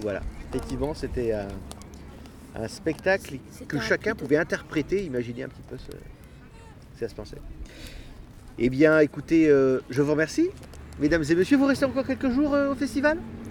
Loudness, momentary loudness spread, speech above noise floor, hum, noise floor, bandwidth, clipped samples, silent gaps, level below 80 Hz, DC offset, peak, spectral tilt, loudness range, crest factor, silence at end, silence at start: -25 LUFS; 22 LU; 22 dB; none; -47 dBFS; 17 kHz; under 0.1%; none; -44 dBFS; under 0.1%; -6 dBFS; -6 dB/octave; 12 LU; 20 dB; 0 s; 0 s